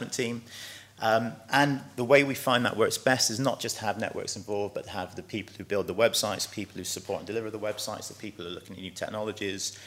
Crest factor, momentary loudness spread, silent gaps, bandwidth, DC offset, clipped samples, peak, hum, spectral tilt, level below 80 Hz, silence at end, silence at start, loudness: 22 dB; 14 LU; none; 16 kHz; under 0.1%; under 0.1%; -8 dBFS; none; -3.5 dB/octave; -68 dBFS; 0 s; 0 s; -29 LUFS